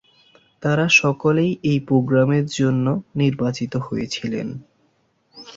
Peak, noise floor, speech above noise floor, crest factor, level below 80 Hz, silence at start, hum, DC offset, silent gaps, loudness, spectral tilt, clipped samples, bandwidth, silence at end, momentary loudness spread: -2 dBFS; -64 dBFS; 45 dB; 18 dB; -56 dBFS; 0.6 s; none; under 0.1%; none; -19 LUFS; -6 dB/octave; under 0.1%; 7.8 kHz; 0 s; 12 LU